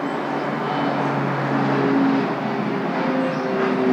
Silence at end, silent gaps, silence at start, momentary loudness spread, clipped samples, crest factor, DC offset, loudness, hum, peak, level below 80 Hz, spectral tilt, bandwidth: 0 s; none; 0 s; 5 LU; under 0.1%; 14 dB; under 0.1%; -21 LUFS; none; -8 dBFS; -70 dBFS; -7.5 dB/octave; 8.4 kHz